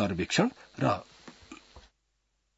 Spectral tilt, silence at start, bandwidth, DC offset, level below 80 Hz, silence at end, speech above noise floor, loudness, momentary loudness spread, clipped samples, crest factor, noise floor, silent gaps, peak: -5 dB/octave; 0 s; 8 kHz; under 0.1%; -62 dBFS; 0.8 s; 47 dB; -30 LUFS; 23 LU; under 0.1%; 22 dB; -77 dBFS; none; -10 dBFS